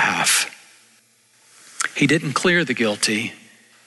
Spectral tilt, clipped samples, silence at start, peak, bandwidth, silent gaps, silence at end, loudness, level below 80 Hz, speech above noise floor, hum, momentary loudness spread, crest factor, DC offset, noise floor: -3 dB/octave; under 0.1%; 0 s; -6 dBFS; 12.5 kHz; none; 0.5 s; -19 LUFS; -62 dBFS; 38 dB; none; 9 LU; 16 dB; under 0.1%; -57 dBFS